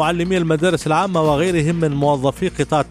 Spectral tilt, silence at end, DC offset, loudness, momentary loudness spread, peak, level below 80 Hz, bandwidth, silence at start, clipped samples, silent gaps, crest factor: -6 dB/octave; 0 s; under 0.1%; -18 LUFS; 3 LU; -4 dBFS; -40 dBFS; 14 kHz; 0 s; under 0.1%; none; 14 dB